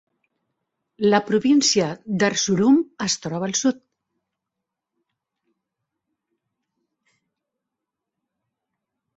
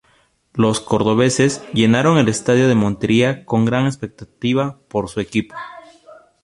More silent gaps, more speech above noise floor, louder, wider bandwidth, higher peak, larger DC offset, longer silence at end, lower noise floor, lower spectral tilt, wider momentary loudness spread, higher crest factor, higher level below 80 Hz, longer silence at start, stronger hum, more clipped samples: neither; first, 64 dB vs 42 dB; second, -20 LUFS vs -17 LUFS; second, 8 kHz vs 11.5 kHz; second, -4 dBFS vs 0 dBFS; neither; first, 5.45 s vs 0.3 s; first, -84 dBFS vs -58 dBFS; second, -4 dB/octave vs -5.5 dB/octave; second, 8 LU vs 13 LU; about the same, 22 dB vs 18 dB; second, -66 dBFS vs -50 dBFS; first, 1 s vs 0.55 s; neither; neither